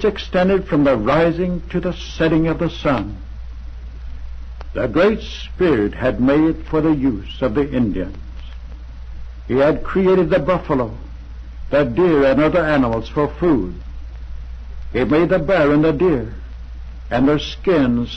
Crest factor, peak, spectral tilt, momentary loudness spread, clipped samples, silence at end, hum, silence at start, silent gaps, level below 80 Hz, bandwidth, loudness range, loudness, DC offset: 12 dB; -6 dBFS; -8 dB/octave; 20 LU; under 0.1%; 0 s; none; 0 s; none; -32 dBFS; 7.8 kHz; 4 LU; -17 LUFS; under 0.1%